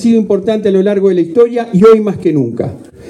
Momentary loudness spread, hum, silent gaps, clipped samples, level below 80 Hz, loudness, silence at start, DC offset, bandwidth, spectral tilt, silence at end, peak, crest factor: 9 LU; none; none; 0.3%; -50 dBFS; -11 LUFS; 0 s; under 0.1%; 10 kHz; -8 dB/octave; 0 s; 0 dBFS; 10 dB